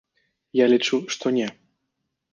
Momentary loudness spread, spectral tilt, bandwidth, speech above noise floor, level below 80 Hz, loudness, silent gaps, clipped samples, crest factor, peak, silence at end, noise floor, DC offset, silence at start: 8 LU; -4 dB/octave; 9.8 kHz; 57 dB; -74 dBFS; -22 LUFS; none; under 0.1%; 18 dB; -6 dBFS; 0.85 s; -78 dBFS; under 0.1%; 0.55 s